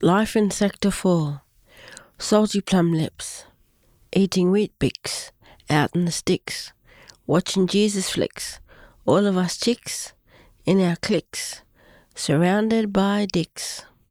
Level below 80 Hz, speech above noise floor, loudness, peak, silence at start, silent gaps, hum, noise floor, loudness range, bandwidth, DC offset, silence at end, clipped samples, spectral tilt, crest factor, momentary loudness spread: -52 dBFS; 38 dB; -22 LUFS; -4 dBFS; 0 s; none; none; -60 dBFS; 2 LU; 15.5 kHz; under 0.1%; 0.3 s; under 0.1%; -5 dB/octave; 20 dB; 16 LU